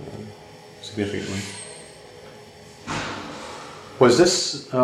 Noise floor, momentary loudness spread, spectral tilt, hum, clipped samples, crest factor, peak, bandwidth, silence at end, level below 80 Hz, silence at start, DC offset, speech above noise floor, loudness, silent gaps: -44 dBFS; 26 LU; -4 dB/octave; none; under 0.1%; 22 dB; -2 dBFS; 14 kHz; 0 s; -56 dBFS; 0 s; under 0.1%; 24 dB; -22 LUFS; none